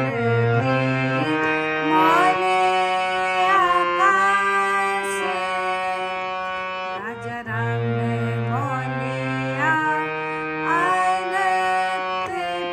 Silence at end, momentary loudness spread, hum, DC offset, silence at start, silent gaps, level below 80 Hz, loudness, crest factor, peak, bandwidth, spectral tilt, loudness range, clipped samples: 0 s; 9 LU; none; under 0.1%; 0 s; none; -58 dBFS; -21 LUFS; 16 dB; -6 dBFS; 15 kHz; -5.5 dB/octave; 7 LU; under 0.1%